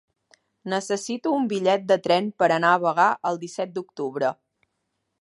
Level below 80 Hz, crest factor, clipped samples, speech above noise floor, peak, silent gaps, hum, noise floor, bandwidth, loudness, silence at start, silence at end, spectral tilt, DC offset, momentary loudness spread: -76 dBFS; 20 dB; under 0.1%; 54 dB; -4 dBFS; none; none; -77 dBFS; 11.5 kHz; -23 LUFS; 0.65 s; 0.85 s; -4.5 dB/octave; under 0.1%; 11 LU